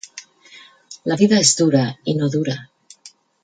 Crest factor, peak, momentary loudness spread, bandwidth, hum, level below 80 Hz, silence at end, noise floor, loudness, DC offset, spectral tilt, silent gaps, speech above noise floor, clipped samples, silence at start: 20 dB; 0 dBFS; 17 LU; 9.6 kHz; none; -62 dBFS; 0.35 s; -48 dBFS; -17 LUFS; under 0.1%; -4 dB/octave; none; 31 dB; under 0.1%; 0.15 s